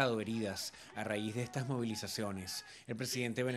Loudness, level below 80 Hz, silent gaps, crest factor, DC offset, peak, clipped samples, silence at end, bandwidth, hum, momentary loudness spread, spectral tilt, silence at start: -39 LUFS; -74 dBFS; none; 22 dB; under 0.1%; -16 dBFS; under 0.1%; 0 s; 16 kHz; none; 7 LU; -4.5 dB/octave; 0 s